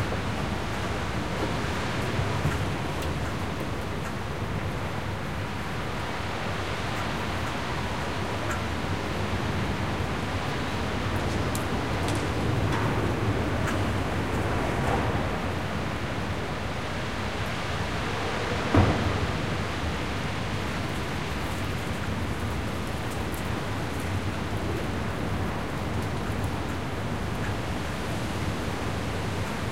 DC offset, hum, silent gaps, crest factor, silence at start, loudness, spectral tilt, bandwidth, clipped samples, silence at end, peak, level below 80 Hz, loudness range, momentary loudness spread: 1%; none; none; 20 dB; 0 s; -29 LUFS; -5.5 dB/octave; 16 kHz; under 0.1%; 0 s; -8 dBFS; -40 dBFS; 3 LU; 4 LU